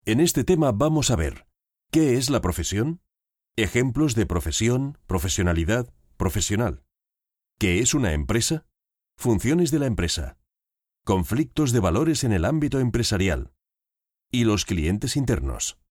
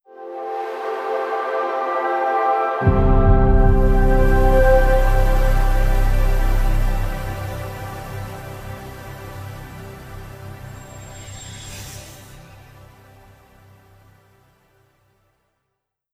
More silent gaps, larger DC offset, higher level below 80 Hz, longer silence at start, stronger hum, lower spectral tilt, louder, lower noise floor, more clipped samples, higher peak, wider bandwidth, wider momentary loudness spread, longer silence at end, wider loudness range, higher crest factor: neither; neither; second, -36 dBFS vs -20 dBFS; second, 0.05 s vs 0.2 s; neither; second, -5 dB/octave vs -7 dB/octave; second, -23 LUFS vs -20 LUFS; first, -89 dBFS vs -78 dBFS; neither; second, -8 dBFS vs -4 dBFS; first, 19 kHz vs 15 kHz; second, 8 LU vs 20 LU; second, 0.2 s vs 3.75 s; second, 2 LU vs 20 LU; about the same, 16 dB vs 16 dB